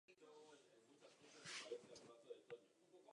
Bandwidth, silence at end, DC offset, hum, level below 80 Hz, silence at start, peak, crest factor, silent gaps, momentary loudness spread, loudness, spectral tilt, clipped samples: 11 kHz; 0 s; under 0.1%; none; under -90 dBFS; 0.1 s; -40 dBFS; 22 dB; none; 15 LU; -59 LUFS; -2 dB/octave; under 0.1%